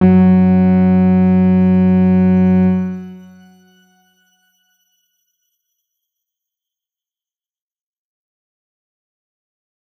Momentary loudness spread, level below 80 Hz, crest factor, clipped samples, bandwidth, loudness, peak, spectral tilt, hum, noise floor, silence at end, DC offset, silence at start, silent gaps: 9 LU; -60 dBFS; 14 dB; under 0.1%; 3.1 kHz; -12 LUFS; -2 dBFS; -11.5 dB/octave; none; under -90 dBFS; 6.8 s; under 0.1%; 0 s; none